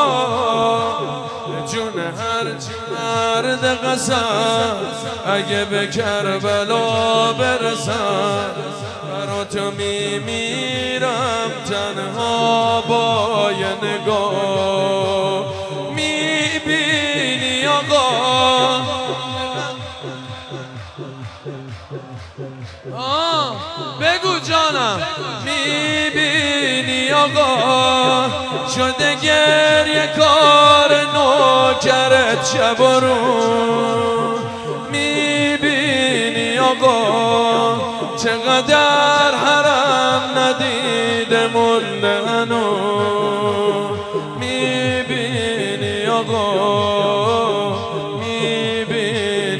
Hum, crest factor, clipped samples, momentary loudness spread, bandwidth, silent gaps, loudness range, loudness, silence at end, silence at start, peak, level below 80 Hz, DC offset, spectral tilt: none; 16 dB; under 0.1%; 12 LU; 11 kHz; none; 8 LU; -16 LUFS; 0 s; 0 s; 0 dBFS; -54 dBFS; under 0.1%; -3.5 dB/octave